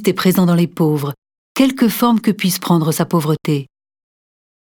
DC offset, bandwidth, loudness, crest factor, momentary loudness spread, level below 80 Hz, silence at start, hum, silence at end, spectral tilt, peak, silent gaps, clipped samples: under 0.1%; 19 kHz; -16 LUFS; 16 dB; 8 LU; -56 dBFS; 0 s; none; 1 s; -6 dB/octave; 0 dBFS; 1.18-1.22 s, 1.38-1.55 s; under 0.1%